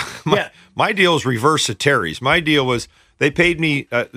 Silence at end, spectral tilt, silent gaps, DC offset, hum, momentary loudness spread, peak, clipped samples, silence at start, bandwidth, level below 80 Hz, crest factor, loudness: 0.1 s; -4 dB/octave; none; under 0.1%; none; 6 LU; -2 dBFS; under 0.1%; 0 s; 15.5 kHz; -46 dBFS; 16 dB; -17 LUFS